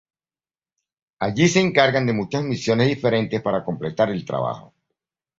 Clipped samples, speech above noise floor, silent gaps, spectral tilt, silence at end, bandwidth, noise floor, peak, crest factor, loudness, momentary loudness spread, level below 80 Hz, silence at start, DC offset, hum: under 0.1%; over 70 dB; none; -5.5 dB/octave; 0.8 s; 8 kHz; under -90 dBFS; 0 dBFS; 22 dB; -21 LUFS; 10 LU; -56 dBFS; 1.2 s; under 0.1%; none